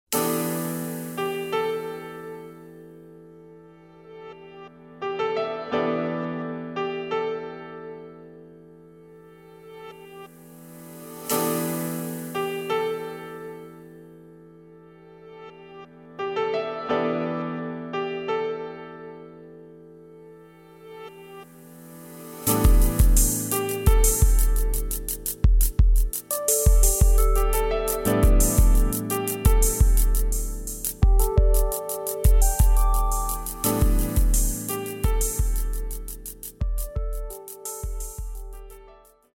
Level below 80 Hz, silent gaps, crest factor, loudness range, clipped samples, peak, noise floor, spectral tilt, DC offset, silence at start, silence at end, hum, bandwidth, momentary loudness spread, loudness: -24 dBFS; none; 18 dB; 14 LU; under 0.1%; -4 dBFS; -51 dBFS; -5 dB/octave; under 0.1%; 0.1 s; 0.55 s; none; 17.5 kHz; 23 LU; -24 LUFS